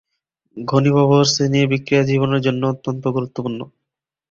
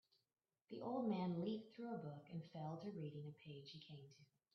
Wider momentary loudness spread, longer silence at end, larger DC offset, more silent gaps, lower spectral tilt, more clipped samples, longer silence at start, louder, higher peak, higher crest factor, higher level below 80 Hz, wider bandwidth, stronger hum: about the same, 13 LU vs 15 LU; first, 0.65 s vs 0.3 s; neither; neither; second, -5.5 dB/octave vs -7 dB/octave; neither; second, 0.55 s vs 0.7 s; first, -17 LUFS vs -49 LUFS; first, -2 dBFS vs -32 dBFS; about the same, 16 dB vs 18 dB; first, -54 dBFS vs -90 dBFS; first, 7.6 kHz vs 6.4 kHz; neither